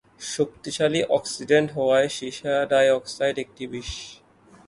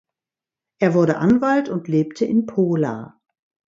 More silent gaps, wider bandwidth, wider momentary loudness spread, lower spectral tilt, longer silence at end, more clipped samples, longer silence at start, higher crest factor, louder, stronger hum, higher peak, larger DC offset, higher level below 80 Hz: neither; first, 11.5 kHz vs 7.6 kHz; first, 14 LU vs 6 LU; second, -4 dB/octave vs -8 dB/octave; about the same, 0.55 s vs 0.6 s; neither; second, 0.2 s vs 0.8 s; about the same, 18 dB vs 18 dB; second, -23 LUFS vs -19 LUFS; neither; about the same, -6 dBFS vs -4 dBFS; neither; first, -52 dBFS vs -58 dBFS